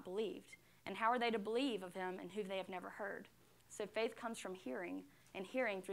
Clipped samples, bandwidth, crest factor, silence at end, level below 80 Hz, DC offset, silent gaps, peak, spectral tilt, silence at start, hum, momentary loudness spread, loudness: under 0.1%; 16 kHz; 20 dB; 0 s; -84 dBFS; under 0.1%; none; -24 dBFS; -4.5 dB/octave; 0 s; none; 15 LU; -43 LUFS